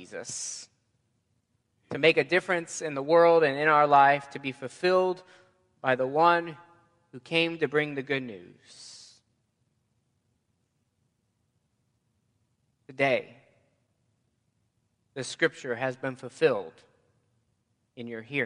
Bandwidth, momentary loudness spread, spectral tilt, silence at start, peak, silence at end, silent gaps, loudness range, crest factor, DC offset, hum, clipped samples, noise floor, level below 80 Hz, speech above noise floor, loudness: 11 kHz; 20 LU; -4 dB/octave; 0 s; -8 dBFS; 0 s; none; 12 LU; 22 dB; under 0.1%; none; under 0.1%; -75 dBFS; -78 dBFS; 49 dB; -26 LUFS